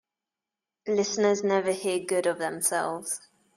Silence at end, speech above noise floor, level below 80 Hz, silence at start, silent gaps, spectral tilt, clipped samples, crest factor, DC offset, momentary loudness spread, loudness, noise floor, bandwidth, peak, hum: 0.4 s; 63 dB; -76 dBFS; 0.85 s; none; -3 dB/octave; under 0.1%; 16 dB; under 0.1%; 9 LU; -27 LUFS; -90 dBFS; 15.5 kHz; -12 dBFS; none